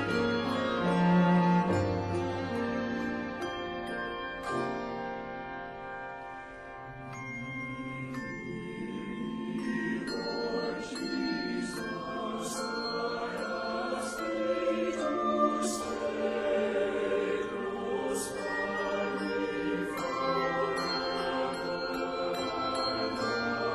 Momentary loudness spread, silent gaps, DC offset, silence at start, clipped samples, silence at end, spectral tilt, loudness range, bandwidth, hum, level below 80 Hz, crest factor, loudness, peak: 10 LU; none; under 0.1%; 0 s; under 0.1%; 0 s; -5.5 dB/octave; 9 LU; 13 kHz; none; -58 dBFS; 16 dB; -32 LUFS; -16 dBFS